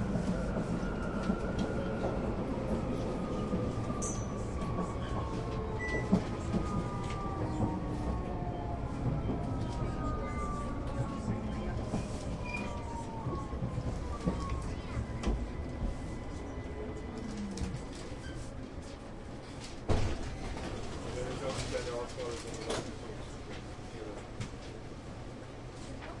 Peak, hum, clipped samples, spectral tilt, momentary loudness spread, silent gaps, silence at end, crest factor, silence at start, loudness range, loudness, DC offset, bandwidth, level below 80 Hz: -14 dBFS; none; under 0.1%; -6.5 dB/octave; 10 LU; none; 0 s; 22 dB; 0 s; 6 LU; -37 LUFS; under 0.1%; 11.5 kHz; -42 dBFS